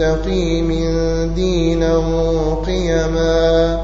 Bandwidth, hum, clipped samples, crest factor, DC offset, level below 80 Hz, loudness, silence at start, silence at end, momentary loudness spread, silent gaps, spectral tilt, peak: 7.6 kHz; none; under 0.1%; 12 dB; 0.7%; -22 dBFS; -17 LUFS; 0 s; 0 s; 4 LU; none; -6.5 dB/octave; -4 dBFS